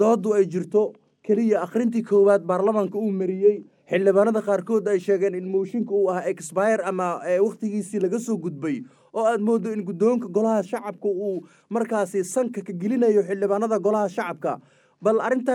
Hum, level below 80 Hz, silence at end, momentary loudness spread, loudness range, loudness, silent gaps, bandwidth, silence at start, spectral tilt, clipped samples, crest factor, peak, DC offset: none; -84 dBFS; 0 s; 9 LU; 3 LU; -23 LUFS; none; 12.5 kHz; 0 s; -7 dB/octave; under 0.1%; 16 dB; -6 dBFS; under 0.1%